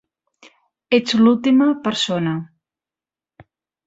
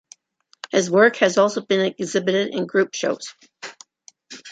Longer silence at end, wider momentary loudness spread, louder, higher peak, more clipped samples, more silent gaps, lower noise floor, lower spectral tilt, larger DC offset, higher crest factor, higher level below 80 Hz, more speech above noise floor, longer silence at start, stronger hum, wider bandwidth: first, 1.4 s vs 0 s; second, 9 LU vs 22 LU; first, -17 LUFS vs -20 LUFS; about the same, -2 dBFS vs -2 dBFS; neither; neither; first, under -90 dBFS vs -61 dBFS; first, -5.5 dB/octave vs -4 dB/octave; neither; about the same, 18 dB vs 20 dB; first, -62 dBFS vs -70 dBFS; first, over 74 dB vs 42 dB; first, 0.9 s vs 0.75 s; neither; second, 8 kHz vs 9.2 kHz